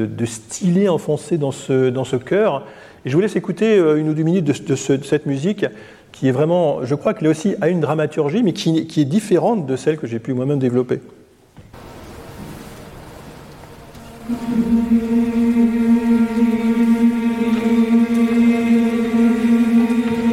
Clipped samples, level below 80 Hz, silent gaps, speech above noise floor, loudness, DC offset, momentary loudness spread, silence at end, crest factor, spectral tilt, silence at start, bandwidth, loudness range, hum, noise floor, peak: under 0.1%; -48 dBFS; none; 28 dB; -17 LUFS; under 0.1%; 15 LU; 0 s; 12 dB; -7 dB/octave; 0 s; 13 kHz; 9 LU; none; -45 dBFS; -6 dBFS